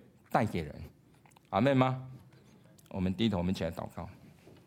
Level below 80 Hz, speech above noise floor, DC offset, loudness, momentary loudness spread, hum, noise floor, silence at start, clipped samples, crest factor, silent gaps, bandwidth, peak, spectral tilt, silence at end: -58 dBFS; 30 dB; under 0.1%; -32 LUFS; 20 LU; none; -61 dBFS; 0.3 s; under 0.1%; 22 dB; none; 16.5 kHz; -12 dBFS; -7.5 dB/octave; 0.15 s